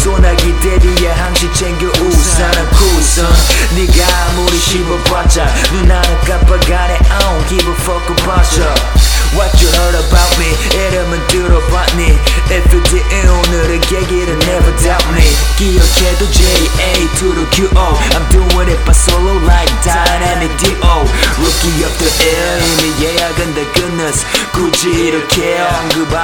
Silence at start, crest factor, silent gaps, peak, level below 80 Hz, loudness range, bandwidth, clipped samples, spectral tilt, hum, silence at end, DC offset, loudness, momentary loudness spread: 0 s; 10 dB; none; 0 dBFS; -12 dBFS; 1 LU; 18 kHz; 0.4%; -4 dB/octave; none; 0 s; under 0.1%; -11 LUFS; 4 LU